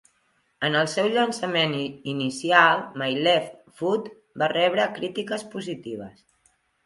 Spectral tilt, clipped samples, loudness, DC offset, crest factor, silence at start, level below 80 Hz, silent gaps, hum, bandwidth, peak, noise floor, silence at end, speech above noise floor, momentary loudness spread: -4 dB/octave; under 0.1%; -24 LUFS; under 0.1%; 24 dB; 0.6 s; -70 dBFS; none; none; 11.5 kHz; 0 dBFS; -68 dBFS; 0.75 s; 44 dB; 14 LU